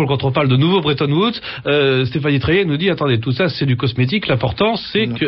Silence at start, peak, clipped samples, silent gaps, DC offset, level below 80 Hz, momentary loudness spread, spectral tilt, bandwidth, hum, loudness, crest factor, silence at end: 0 s; -4 dBFS; under 0.1%; none; under 0.1%; -42 dBFS; 4 LU; -9.5 dB/octave; 5.8 kHz; none; -16 LUFS; 12 dB; 0 s